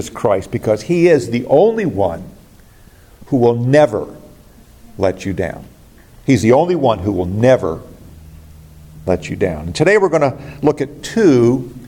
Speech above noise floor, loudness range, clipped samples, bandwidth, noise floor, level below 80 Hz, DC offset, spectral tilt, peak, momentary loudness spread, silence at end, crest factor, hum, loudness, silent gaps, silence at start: 29 dB; 3 LU; under 0.1%; 17 kHz; -44 dBFS; -44 dBFS; under 0.1%; -7 dB/octave; 0 dBFS; 11 LU; 0 s; 16 dB; none; -15 LUFS; none; 0 s